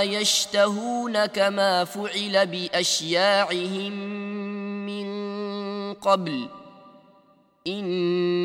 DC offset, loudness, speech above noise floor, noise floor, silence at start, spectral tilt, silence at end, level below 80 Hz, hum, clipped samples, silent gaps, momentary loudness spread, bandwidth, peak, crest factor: under 0.1%; -24 LUFS; 35 dB; -59 dBFS; 0 s; -3 dB/octave; 0 s; -74 dBFS; none; under 0.1%; none; 11 LU; 16.5 kHz; -6 dBFS; 18 dB